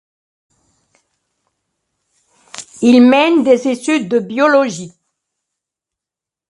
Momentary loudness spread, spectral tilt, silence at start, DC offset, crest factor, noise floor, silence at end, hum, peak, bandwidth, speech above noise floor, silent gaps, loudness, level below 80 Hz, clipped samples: 23 LU; -4.5 dB/octave; 2.55 s; under 0.1%; 16 dB; -86 dBFS; 1.6 s; none; 0 dBFS; 11.5 kHz; 75 dB; none; -12 LUFS; -64 dBFS; under 0.1%